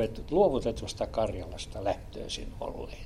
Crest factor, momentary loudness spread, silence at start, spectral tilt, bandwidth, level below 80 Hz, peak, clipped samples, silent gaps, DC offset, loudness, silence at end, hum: 20 dB; 13 LU; 0 s; -5.5 dB/octave; 14.5 kHz; -44 dBFS; -12 dBFS; under 0.1%; none; under 0.1%; -32 LUFS; 0 s; none